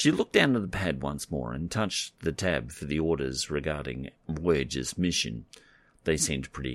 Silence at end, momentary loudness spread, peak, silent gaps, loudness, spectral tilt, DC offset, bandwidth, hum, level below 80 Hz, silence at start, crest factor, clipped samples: 0 s; 10 LU; -6 dBFS; none; -29 LUFS; -4 dB/octave; under 0.1%; 16 kHz; none; -46 dBFS; 0 s; 24 dB; under 0.1%